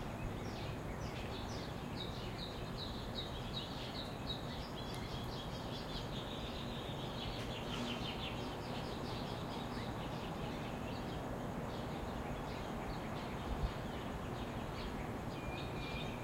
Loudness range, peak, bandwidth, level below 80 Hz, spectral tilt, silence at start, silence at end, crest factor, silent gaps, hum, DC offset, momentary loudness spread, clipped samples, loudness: 1 LU; -26 dBFS; 16 kHz; -52 dBFS; -5.5 dB/octave; 0 s; 0 s; 16 dB; none; none; under 0.1%; 2 LU; under 0.1%; -43 LUFS